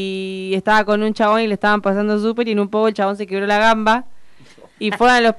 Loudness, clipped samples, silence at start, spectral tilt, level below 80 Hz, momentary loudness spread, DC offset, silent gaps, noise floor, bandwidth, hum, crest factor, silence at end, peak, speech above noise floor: -17 LUFS; under 0.1%; 0 s; -5 dB/octave; -48 dBFS; 8 LU; under 0.1%; none; -45 dBFS; 12 kHz; none; 12 dB; 0 s; -6 dBFS; 29 dB